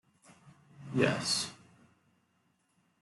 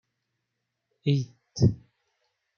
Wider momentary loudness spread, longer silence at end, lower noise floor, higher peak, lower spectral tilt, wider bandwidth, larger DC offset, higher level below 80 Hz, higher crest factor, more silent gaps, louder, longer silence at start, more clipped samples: about the same, 13 LU vs 13 LU; first, 1.45 s vs 0.85 s; second, -74 dBFS vs -82 dBFS; second, -12 dBFS vs -8 dBFS; second, -3.5 dB/octave vs -7 dB/octave; first, 12.5 kHz vs 7 kHz; neither; second, -74 dBFS vs -56 dBFS; about the same, 26 dB vs 22 dB; neither; second, -32 LUFS vs -27 LUFS; second, 0.45 s vs 1.05 s; neither